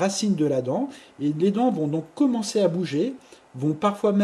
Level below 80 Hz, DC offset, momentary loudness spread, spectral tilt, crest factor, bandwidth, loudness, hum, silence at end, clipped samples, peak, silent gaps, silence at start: -70 dBFS; under 0.1%; 7 LU; -6 dB/octave; 16 dB; 12.5 kHz; -24 LUFS; none; 0 s; under 0.1%; -8 dBFS; none; 0 s